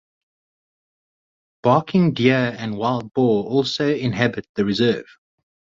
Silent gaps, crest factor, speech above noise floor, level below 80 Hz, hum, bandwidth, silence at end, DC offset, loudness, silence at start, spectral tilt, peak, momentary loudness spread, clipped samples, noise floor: 4.49-4.55 s; 18 dB; over 71 dB; -56 dBFS; none; 7.6 kHz; 0.75 s; under 0.1%; -20 LUFS; 1.65 s; -7 dB/octave; -2 dBFS; 7 LU; under 0.1%; under -90 dBFS